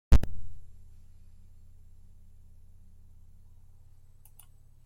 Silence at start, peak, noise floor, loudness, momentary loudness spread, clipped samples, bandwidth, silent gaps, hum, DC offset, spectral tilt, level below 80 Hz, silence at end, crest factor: 0.1 s; -8 dBFS; -53 dBFS; -31 LUFS; 17 LU; under 0.1%; 15.5 kHz; none; none; under 0.1%; -7 dB/octave; -36 dBFS; 4.15 s; 22 dB